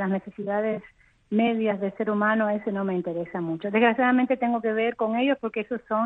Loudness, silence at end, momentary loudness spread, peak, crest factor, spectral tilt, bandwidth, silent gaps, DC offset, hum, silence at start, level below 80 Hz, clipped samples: -25 LUFS; 0 s; 8 LU; -8 dBFS; 18 dB; -9 dB/octave; 4 kHz; none; under 0.1%; none; 0 s; -66 dBFS; under 0.1%